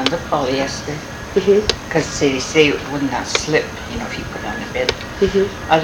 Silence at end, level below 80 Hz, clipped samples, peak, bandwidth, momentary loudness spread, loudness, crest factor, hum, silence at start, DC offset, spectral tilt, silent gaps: 0 s; -38 dBFS; under 0.1%; 0 dBFS; 19 kHz; 11 LU; -19 LUFS; 18 dB; none; 0 s; under 0.1%; -4 dB/octave; none